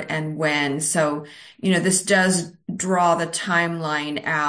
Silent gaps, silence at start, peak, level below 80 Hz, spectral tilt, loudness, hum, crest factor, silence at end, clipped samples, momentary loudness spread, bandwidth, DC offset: none; 0 s; -6 dBFS; -66 dBFS; -3.5 dB/octave; -21 LUFS; none; 16 dB; 0 s; under 0.1%; 10 LU; 10.5 kHz; under 0.1%